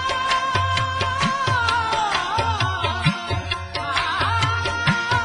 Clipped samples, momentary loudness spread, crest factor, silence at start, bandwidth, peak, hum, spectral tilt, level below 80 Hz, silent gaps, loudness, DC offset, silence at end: under 0.1%; 4 LU; 16 dB; 0 s; 10.5 kHz; -4 dBFS; none; -4 dB/octave; -42 dBFS; none; -21 LUFS; under 0.1%; 0 s